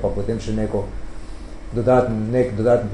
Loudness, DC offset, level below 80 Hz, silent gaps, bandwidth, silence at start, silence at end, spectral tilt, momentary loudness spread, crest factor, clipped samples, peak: -21 LUFS; under 0.1%; -34 dBFS; none; 10.5 kHz; 0 s; 0 s; -8 dB/octave; 21 LU; 18 dB; under 0.1%; -2 dBFS